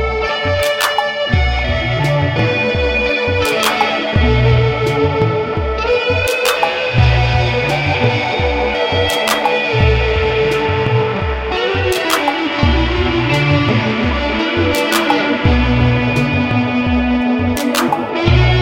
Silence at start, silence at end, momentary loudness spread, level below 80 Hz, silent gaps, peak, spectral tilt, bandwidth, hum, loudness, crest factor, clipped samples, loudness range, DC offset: 0 s; 0 s; 3 LU; -24 dBFS; none; 0 dBFS; -5.5 dB/octave; 16.5 kHz; none; -14 LUFS; 14 dB; under 0.1%; 1 LU; under 0.1%